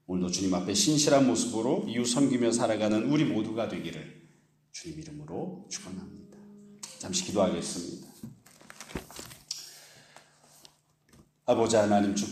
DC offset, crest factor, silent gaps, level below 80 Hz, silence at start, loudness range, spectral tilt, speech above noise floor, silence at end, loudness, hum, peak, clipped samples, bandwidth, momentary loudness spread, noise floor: under 0.1%; 20 dB; none; -62 dBFS; 0.1 s; 16 LU; -4.5 dB/octave; 35 dB; 0 s; -28 LUFS; none; -10 dBFS; under 0.1%; 15 kHz; 21 LU; -63 dBFS